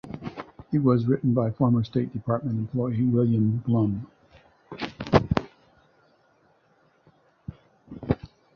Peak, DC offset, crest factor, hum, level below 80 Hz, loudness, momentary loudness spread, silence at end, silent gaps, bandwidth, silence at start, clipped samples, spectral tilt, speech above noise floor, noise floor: -2 dBFS; under 0.1%; 24 dB; none; -48 dBFS; -25 LUFS; 22 LU; 0.3 s; none; 6.6 kHz; 0.05 s; under 0.1%; -9.5 dB/octave; 40 dB; -63 dBFS